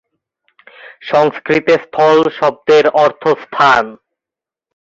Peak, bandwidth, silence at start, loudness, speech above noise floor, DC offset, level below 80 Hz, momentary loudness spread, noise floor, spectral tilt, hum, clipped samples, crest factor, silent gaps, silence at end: 0 dBFS; 7.6 kHz; 0.85 s; -12 LUFS; 75 dB; under 0.1%; -56 dBFS; 6 LU; -87 dBFS; -5 dB/octave; none; under 0.1%; 14 dB; none; 0.95 s